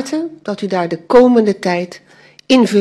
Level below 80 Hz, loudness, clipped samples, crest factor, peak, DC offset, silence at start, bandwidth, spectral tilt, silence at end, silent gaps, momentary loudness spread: -50 dBFS; -14 LUFS; under 0.1%; 14 dB; 0 dBFS; under 0.1%; 0 s; 12 kHz; -5.5 dB/octave; 0 s; none; 14 LU